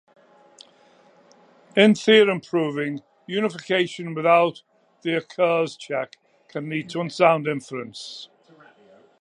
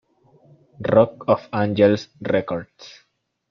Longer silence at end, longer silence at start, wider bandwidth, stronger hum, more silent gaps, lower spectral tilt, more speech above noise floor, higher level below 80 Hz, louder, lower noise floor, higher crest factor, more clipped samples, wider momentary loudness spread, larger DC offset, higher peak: first, 0.95 s vs 0.6 s; first, 1.75 s vs 0.8 s; first, 11 kHz vs 6.6 kHz; neither; neither; second, -5.5 dB/octave vs -7.5 dB/octave; about the same, 34 dB vs 35 dB; second, -76 dBFS vs -58 dBFS; about the same, -22 LUFS vs -20 LUFS; about the same, -55 dBFS vs -55 dBFS; about the same, 22 dB vs 20 dB; neither; first, 18 LU vs 12 LU; neither; about the same, -2 dBFS vs -2 dBFS